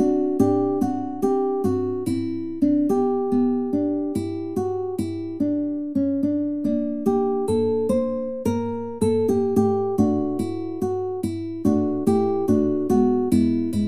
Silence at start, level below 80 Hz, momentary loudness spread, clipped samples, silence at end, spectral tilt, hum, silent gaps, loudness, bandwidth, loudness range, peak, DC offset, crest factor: 0 s; -54 dBFS; 7 LU; under 0.1%; 0 s; -8.5 dB/octave; none; none; -23 LUFS; 15 kHz; 2 LU; -6 dBFS; 0.8%; 16 dB